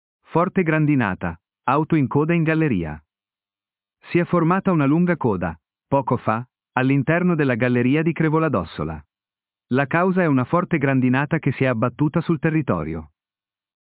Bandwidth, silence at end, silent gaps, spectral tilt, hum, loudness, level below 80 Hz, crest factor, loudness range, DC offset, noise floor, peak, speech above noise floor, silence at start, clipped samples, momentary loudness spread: 4 kHz; 0.75 s; none; -12 dB/octave; none; -20 LUFS; -48 dBFS; 18 dB; 2 LU; under 0.1%; under -90 dBFS; -2 dBFS; over 71 dB; 0.3 s; under 0.1%; 9 LU